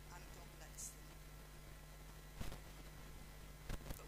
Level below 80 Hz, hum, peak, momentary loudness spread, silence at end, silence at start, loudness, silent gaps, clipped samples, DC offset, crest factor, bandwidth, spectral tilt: -56 dBFS; none; -32 dBFS; 7 LU; 0 s; 0 s; -55 LUFS; none; under 0.1%; under 0.1%; 20 dB; 15.5 kHz; -3.5 dB/octave